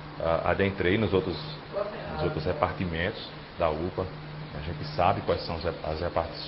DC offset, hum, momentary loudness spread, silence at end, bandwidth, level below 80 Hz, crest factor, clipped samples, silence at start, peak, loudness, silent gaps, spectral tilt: under 0.1%; none; 11 LU; 0 s; 5.8 kHz; -44 dBFS; 24 dB; under 0.1%; 0 s; -6 dBFS; -29 LUFS; none; -10.5 dB/octave